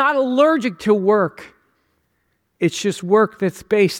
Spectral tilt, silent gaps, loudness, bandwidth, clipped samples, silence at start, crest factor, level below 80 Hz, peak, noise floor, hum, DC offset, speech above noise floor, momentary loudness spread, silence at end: -5.5 dB/octave; none; -18 LUFS; 16 kHz; under 0.1%; 0 s; 16 dB; -60 dBFS; -2 dBFS; -68 dBFS; none; under 0.1%; 51 dB; 7 LU; 0 s